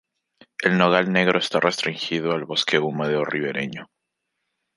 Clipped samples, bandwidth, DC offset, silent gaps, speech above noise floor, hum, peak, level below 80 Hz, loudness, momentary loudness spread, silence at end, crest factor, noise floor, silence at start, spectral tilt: under 0.1%; 11.5 kHz; under 0.1%; none; 57 dB; none; -2 dBFS; -66 dBFS; -21 LUFS; 10 LU; 0.95 s; 22 dB; -79 dBFS; 0.6 s; -5 dB/octave